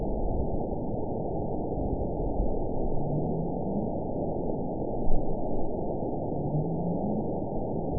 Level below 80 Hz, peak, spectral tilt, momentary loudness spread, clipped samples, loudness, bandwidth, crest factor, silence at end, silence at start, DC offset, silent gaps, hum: -34 dBFS; -10 dBFS; -17 dB/octave; 3 LU; under 0.1%; -32 LUFS; 1 kHz; 18 dB; 0 s; 0 s; 1%; none; none